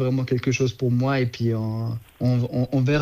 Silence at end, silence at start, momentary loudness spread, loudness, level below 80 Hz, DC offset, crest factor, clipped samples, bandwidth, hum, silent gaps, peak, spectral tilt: 0 s; 0 s; 5 LU; -24 LUFS; -52 dBFS; under 0.1%; 14 dB; under 0.1%; 7.2 kHz; none; none; -10 dBFS; -7 dB/octave